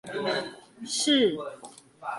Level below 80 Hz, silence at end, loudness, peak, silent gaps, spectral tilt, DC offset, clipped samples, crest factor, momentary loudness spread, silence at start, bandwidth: -72 dBFS; 0 s; -26 LUFS; -12 dBFS; none; -2.5 dB/octave; under 0.1%; under 0.1%; 16 dB; 22 LU; 0.05 s; 11.5 kHz